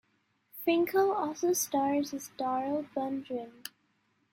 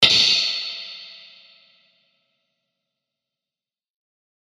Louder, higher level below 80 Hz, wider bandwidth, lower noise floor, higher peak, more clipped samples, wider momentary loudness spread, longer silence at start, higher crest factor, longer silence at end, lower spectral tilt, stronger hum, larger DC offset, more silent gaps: second, -31 LUFS vs -17 LUFS; second, -78 dBFS vs -66 dBFS; about the same, 16.5 kHz vs 15.5 kHz; second, -74 dBFS vs under -90 dBFS; second, -16 dBFS vs 0 dBFS; neither; second, 15 LU vs 24 LU; first, 0.55 s vs 0 s; second, 16 dB vs 26 dB; second, 0.65 s vs 3.35 s; first, -3 dB/octave vs -0.5 dB/octave; neither; neither; neither